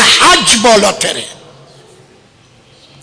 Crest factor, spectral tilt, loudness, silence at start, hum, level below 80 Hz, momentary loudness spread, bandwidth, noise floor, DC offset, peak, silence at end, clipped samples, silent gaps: 12 dB; -1 dB/octave; -7 LUFS; 0 s; none; -42 dBFS; 15 LU; 11 kHz; -45 dBFS; under 0.1%; 0 dBFS; 1.7 s; under 0.1%; none